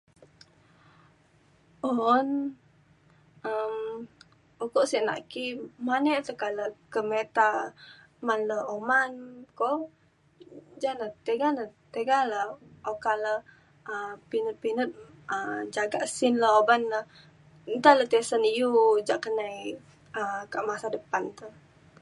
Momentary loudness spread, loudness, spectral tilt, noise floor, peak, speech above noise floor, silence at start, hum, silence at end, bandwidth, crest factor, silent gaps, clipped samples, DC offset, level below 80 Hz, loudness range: 16 LU; -28 LUFS; -3.5 dB/octave; -62 dBFS; -4 dBFS; 35 dB; 1.85 s; none; 0.5 s; 11.5 kHz; 24 dB; none; under 0.1%; under 0.1%; -74 dBFS; 7 LU